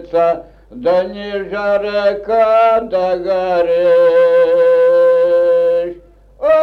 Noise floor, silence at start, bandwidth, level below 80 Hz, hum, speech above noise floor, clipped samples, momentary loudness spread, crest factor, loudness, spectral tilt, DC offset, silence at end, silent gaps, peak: -39 dBFS; 0 s; 5.6 kHz; -48 dBFS; none; 26 dB; under 0.1%; 10 LU; 8 dB; -13 LUFS; -6 dB/octave; under 0.1%; 0 s; none; -4 dBFS